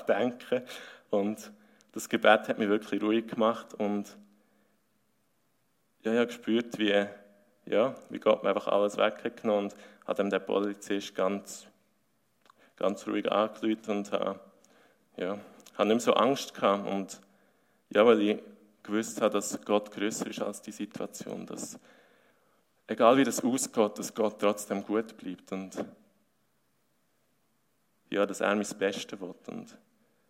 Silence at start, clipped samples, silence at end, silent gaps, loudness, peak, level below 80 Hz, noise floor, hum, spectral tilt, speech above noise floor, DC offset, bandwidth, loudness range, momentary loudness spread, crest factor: 0 s; under 0.1%; 0.65 s; none; -30 LUFS; -6 dBFS; -82 dBFS; -75 dBFS; none; -4 dB/octave; 45 dB; under 0.1%; 16 kHz; 6 LU; 16 LU; 24 dB